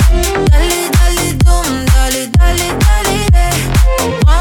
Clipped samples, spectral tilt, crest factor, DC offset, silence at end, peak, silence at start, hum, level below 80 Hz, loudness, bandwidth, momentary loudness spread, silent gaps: under 0.1%; -4.5 dB/octave; 10 dB; under 0.1%; 0 s; 0 dBFS; 0 s; none; -12 dBFS; -12 LUFS; 19 kHz; 2 LU; none